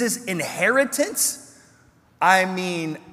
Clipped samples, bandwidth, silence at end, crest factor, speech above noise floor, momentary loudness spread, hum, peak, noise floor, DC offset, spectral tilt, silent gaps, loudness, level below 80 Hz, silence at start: under 0.1%; 16 kHz; 0 s; 20 dB; 34 dB; 9 LU; none; -2 dBFS; -56 dBFS; under 0.1%; -3 dB/octave; none; -21 LUFS; -70 dBFS; 0 s